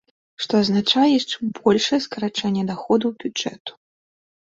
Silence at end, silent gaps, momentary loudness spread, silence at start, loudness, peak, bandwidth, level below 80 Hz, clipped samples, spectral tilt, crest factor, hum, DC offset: 0.9 s; 3.60-3.65 s; 11 LU; 0.4 s; -21 LUFS; -4 dBFS; 7.8 kHz; -62 dBFS; under 0.1%; -5 dB/octave; 18 dB; none; under 0.1%